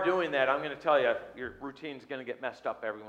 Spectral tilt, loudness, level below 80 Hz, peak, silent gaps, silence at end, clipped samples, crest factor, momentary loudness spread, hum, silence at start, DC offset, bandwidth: -5.5 dB/octave; -31 LUFS; -68 dBFS; -12 dBFS; none; 0 s; under 0.1%; 20 dB; 14 LU; none; 0 s; under 0.1%; 8.4 kHz